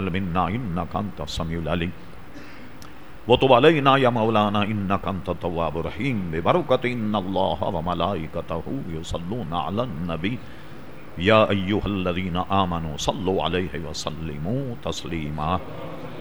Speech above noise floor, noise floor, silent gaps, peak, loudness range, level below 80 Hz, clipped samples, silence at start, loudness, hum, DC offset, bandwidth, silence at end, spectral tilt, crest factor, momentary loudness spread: 20 dB; -43 dBFS; none; 0 dBFS; 7 LU; -44 dBFS; under 0.1%; 0 s; -24 LUFS; none; 2%; over 20 kHz; 0 s; -6 dB/octave; 24 dB; 18 LU